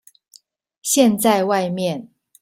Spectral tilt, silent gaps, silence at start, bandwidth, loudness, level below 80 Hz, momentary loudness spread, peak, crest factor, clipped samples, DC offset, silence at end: -4 dB/octave; none; 0.85 s; 16.5 kHz; -18 LUFS; -64 dBFS; 13 LU; -2 dBFS; 18 dB; under 0.1%; under 0.1%; 0.35 s